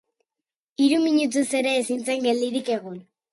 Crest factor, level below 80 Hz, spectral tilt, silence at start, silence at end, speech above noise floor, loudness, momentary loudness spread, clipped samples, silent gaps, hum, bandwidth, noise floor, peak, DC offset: 16 dB; -74 dBFS; -3.5 dB/octave; 0.8 s; 0.3 s; 66 dB; -23 LUFS; 14 LU; under 0.1%; none; none; 11.5 kHz; -88 dBFS; -8 dBFS; under 0.1%